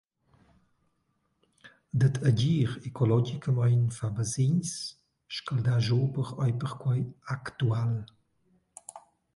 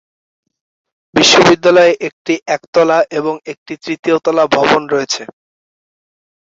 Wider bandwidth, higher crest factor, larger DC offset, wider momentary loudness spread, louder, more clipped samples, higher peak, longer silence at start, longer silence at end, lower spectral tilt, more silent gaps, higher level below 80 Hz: first, 11.5 kHz vs 8 kHz; about the same, 18 dB vs 14 dB; neither; about the same, 12 LU vs 13 LU; second, -29 LUFS vs -12 LUFS; neither; second, -12 dBFS vs 0 dBFS; first, 1.65 s vs 1.15 s; second, 0.35 s vs 1.25 s; first, -6.5 dB/octave vs -3.5 dB/octave; second, none vs 2.13-2.25 s, 2.68-2.73 s, 3.58-3.66 s, 3.99-4.03 s; second, -60 dBFS vs -52 dBFS